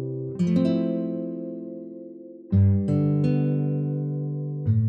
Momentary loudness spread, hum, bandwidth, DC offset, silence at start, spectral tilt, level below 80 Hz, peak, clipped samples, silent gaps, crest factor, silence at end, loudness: 17 LU; none; 6.2 kHz; under 0.1%; 0 s; -10.5 dB/octave; -62 dBFS; -10 dBFS; under 0.1%; none; 14 dB; 0 s; -25 LUFS